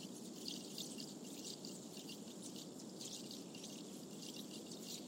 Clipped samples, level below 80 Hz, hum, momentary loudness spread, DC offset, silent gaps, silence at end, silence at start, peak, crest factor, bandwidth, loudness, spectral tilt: under 0.1%; under -90 dBFS; none; 4 LU; under 0.1%; none; 0 s; 0 s; -30 dBFS; 22 dB; 16.5 kHz; -50 LUFS; -3 dB/octave